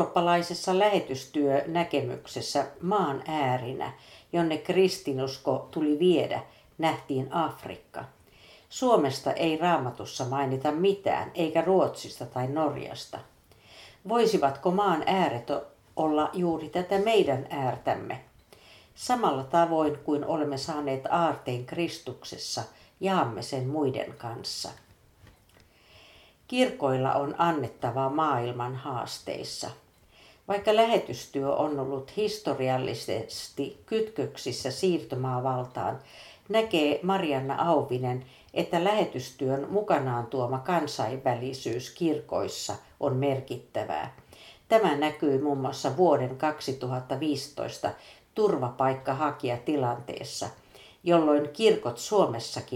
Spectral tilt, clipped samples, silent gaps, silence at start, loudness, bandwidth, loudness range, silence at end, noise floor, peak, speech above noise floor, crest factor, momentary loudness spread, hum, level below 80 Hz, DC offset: -5.5 dB/octave; under 0.1%; none; 0 s; -28 LUFS; 16.5 kHz; 4 LU; 0 s; -59 dBFS; -8 dBFS; 32 dB; 20 dB; 11 LU; none; -66 dBFS; under 0.1%